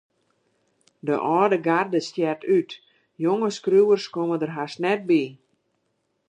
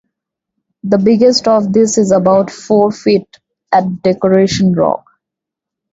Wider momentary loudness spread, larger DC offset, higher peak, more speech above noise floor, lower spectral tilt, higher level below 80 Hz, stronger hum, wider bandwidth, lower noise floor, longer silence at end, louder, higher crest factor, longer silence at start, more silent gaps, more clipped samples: first, 9 LU vs 6 LU; neither; second, -6 dBFS vs 0 dBFS; second, 51 dB vs 71 dB; about the same, -6 dB/octave vs -5.5 dB/octave; second, -78 dBFS vs -50 dBFS; neither; first, 9.8 kHz vs 8 kHz; second, -73 dBFS vs -82 dBFS; about the same, 0.95 s vs 0.95 s; second, -23 LUFS vs -12 LUFS; first, 18 dB vs 12 dB; first, 1.05 s vs 0.85 s; neither; neither